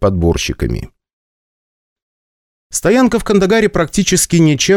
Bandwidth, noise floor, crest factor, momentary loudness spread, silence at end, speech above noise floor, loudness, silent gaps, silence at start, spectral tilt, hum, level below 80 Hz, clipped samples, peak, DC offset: 17 kHz; under -90 dBFS; 14 dB; 9 LU; 0 s; over 78 dB; -13 LUFS; 1.13-1.96 s, 2.02-2.70 s; 0 s; -4.5 dB/octave; none; -30 dBFS; under 0.1%; 0 dBFS; under 0.1%